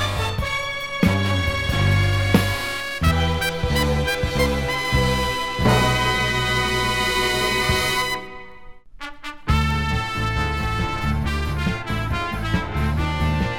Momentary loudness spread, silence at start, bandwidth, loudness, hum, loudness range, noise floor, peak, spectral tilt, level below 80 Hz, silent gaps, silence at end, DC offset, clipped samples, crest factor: 6 LU; 0 s; 19 kHz; -21 LUFS; none; 4 LU; -41 dBFS; -4 dBFS; -5 dB/octave; -30 dBFS; none; 0 s; 1%; under 0.1%; 16 dB